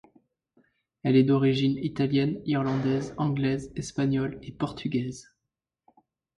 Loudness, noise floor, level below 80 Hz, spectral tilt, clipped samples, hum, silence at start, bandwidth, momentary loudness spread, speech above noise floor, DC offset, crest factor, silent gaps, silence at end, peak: -27 LUFS; -86 dBFS; -58 dBFS; -7 dB/octave; under 0.1%; none; 1.05 s; 11 kHz; 11 LU; 60 dB; under 0.1%; 18 dB; none; 1.15 s; -10 dBFS